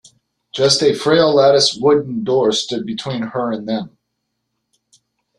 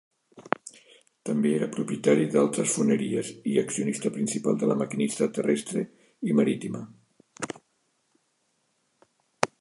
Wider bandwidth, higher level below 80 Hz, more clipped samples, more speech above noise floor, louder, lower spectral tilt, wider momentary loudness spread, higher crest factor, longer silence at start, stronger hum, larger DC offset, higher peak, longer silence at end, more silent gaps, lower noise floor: about the same, 12 kHz vs 11.5 kHz; first, -58 dBFS vs -74 dBFS; neither; first, 58 dB vs 47 dB; first, -16 LUFS vs -27 LUFS; about the same, -4 dB/octave vs -5 dB/octave; about the same, 12 LU vs 13 LU; second, 18 dB vs 26 dB; first, 0.55 s vs 0.35 s; neither; neither; about the same, 0 dBFS vs -2 dBFS; first, 1.5 s vs 0.15 s; neither; about the same, -74 dBFS vs -73 dBFS